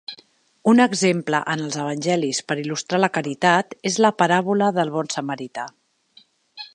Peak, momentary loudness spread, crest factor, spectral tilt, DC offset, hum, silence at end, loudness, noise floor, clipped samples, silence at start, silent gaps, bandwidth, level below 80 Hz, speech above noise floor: -2 dBFS; 13 LU; 20 dB; -4.5 dB/octave; under 0.1%; none; 0.1 s; -20 LUFS; -55 dBFS; under 0.1%; 0.1 s; none; 10.5 kHz; -72 dBFS; 35 dB